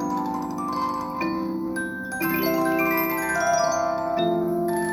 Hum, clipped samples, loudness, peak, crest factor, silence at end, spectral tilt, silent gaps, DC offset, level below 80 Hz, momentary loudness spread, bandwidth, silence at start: none; under 0.1%; -24 LUFS; -10 dBFS; 14 dB; 0 s; -4.5 dB/octave; none; under 0.1%; -54 dBFS; 7 LU; 19 kHz; 0 s